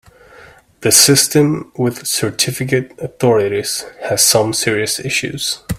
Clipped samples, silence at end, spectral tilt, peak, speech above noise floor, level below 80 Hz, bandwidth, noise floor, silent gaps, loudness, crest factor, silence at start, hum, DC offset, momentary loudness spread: under 0.1%; 0 s; -3 dB/octave; 0 dBFS; 27 dB; -46 dBFS; 17 kHz; -43 dBFS; none; -14 LUFS; 16 dB; 0.4 s; none; under 0.1%; 11 LU